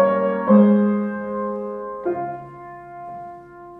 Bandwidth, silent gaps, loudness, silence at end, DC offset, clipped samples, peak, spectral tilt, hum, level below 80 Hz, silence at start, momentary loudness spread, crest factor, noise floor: 3.6 kHz; none; -20 LUFS; 0 s; under 0.1%; under 0.1%; -4 dBFS; -11.5 dB/octave; none; -62 dBFS; 0 s; 23 LU; 18 dB; -40 dBFS